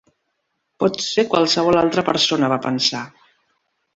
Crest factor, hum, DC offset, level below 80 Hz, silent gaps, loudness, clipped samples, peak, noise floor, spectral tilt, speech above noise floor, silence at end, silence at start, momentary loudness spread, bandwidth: 18 dB; none; under 0.1%; -56 dBFS; none; -18 LUFS; under 0.1%; -2 dBFS; -73 dBFS; -4 dB/octave; 55 dB; 0.9 s; 0.8 s; 6 LU; 8 kHz